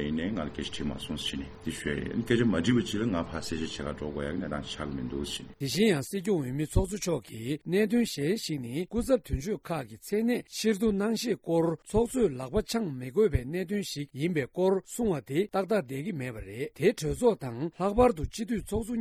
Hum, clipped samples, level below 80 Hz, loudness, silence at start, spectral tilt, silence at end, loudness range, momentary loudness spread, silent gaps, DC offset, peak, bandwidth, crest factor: none; under 0.1%; -44 dBFS; -30 LUFS; 0 s; -5.5 dB/octave; 0 s; 2 LU; 9 LU; none; under 0.1%; -10 dBFS; 16 kHz; 20 dB